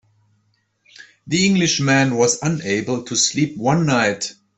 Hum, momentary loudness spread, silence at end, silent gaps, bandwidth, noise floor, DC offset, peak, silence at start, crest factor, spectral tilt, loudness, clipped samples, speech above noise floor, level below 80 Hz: none; 6 LU; 0.25 s; none; 8.4 kHz; -65 dBFS; under 0.1%; -2 dBFS; 1 s; 18 dB; -4 dB/octave; -18 LUFS; under 0.1%; 47 dB; -56 dBFS